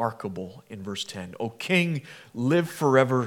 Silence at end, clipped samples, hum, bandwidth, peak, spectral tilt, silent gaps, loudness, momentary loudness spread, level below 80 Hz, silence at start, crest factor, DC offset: 0 s; under 0.1%; none; 17.5 kHz; -4 dBFS; -6 dB/octave; none; -26 LUFS; 17 LU; -72 dBFS; 0 s; 22 dB; under 0.1%